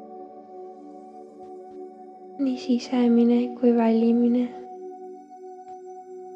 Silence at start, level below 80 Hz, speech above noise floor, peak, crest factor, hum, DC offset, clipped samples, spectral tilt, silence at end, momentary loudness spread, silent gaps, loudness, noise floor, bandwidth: 0 s; -80 dBFS; 23 dB; -8 dBFS; 16 dB; none; under 0.1%; under 0.1%; -7 dB/octave; 0 s; 23 LU; none; -22 LUFS; -43 dBFS; 7.4 kHz